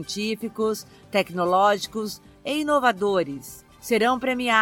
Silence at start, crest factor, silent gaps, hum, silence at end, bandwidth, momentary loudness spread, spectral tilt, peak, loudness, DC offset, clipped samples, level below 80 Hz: 0 s; 18 dB; none; none; 0 s; 17 kHz; 14 LU; -4 dB/octave; -6 dBFS; -24 LUFS; under 0.1%; under 0.1%; -60 dBFS